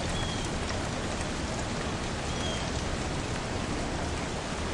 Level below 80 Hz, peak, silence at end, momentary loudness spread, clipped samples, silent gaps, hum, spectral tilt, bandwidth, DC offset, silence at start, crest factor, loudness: -40 dBFS; -18 dBFS; 0 s; 2 LU; under 0.1%; none; none; -4 dB/octave; 11.5 kHz; under 0.1%; 0 s; 14 dB; -32 LUFS